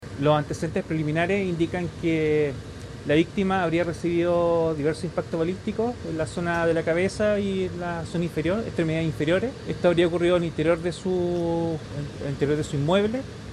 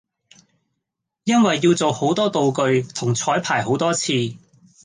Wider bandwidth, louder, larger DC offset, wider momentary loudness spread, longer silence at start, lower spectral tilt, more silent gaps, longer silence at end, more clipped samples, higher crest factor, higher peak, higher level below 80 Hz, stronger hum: first, 12 kHz vs 10 kHz; second, -25 LUFS vs -19 LUFS; neither; about the same, 7 LU vs 6 LU; second, 0 s vs 1.25 s; first, -6.5 dB/octave vs -4.5 dB/octave; neither; second, 0 s vs 0.45 s; neither; about the same, 16 dB vs 16 dB; about the same, -8 dBFS vs -6 dBFS; first, -48 dBFS vs -62 dBFS; neither